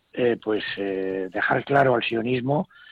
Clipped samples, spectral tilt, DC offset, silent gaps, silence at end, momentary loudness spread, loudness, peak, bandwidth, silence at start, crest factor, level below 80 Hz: under 0.1%; -8 dB/octave; under 0.1%; none; 0.25 s; 8 LU; -24 LUFS; -6 dBFS; 7 kHz; 0.15 s; 18 dB; -60 dBFS